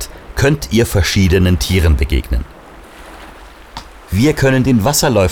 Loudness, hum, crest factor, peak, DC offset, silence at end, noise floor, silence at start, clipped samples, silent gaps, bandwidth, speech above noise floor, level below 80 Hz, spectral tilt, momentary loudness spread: -14 LUFS; none; 12 dB; -2 dBFS; under 0.1%; 0 s; -36 dBFS; 0 s; under 0.1%; none; 19 kHz; 24 dB; -24 dBFS; -5 dB/octave; 21 LU